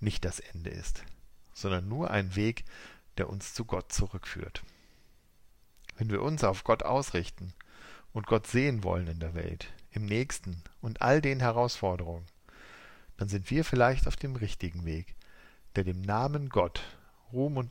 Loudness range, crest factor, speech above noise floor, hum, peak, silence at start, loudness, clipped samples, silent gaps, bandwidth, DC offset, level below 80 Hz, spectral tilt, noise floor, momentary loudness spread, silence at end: 4 LU; 20 dB; 29 dB; none; -12 dBFS; 0 s; -32 LUFS; under 0.1%; none; 16 kHz; under 0.1%; -44 dBFS; -6 dB/octave; -60 dBFS; 19 LU; 0 s